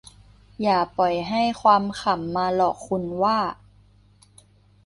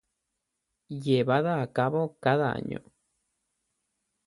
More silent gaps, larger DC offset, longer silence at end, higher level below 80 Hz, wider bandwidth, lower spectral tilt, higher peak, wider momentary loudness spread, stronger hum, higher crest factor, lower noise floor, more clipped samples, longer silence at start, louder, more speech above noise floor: neither; neither; about the same, 1.35 s vs 1.45 s; first, -54 dBFS vs -66 dBFS; about the same, 11.5 kHz vs 11.5 kHz; second, -5.5 dB/octave vs -8 dB/octave; first, -4 dBFS vs -10 dBFS; second, 8 LU vs 14 LU; first, 50 Hz at -45 dBFS vs none; about the same, 20 dB vs 20 dB; second, -55 dBFS vs -83 dBFS; neither; second, 0.6 s vs 0.9 s; first, -22 LUFS vs -27 LUFS; second, 33 dB vs 56 dB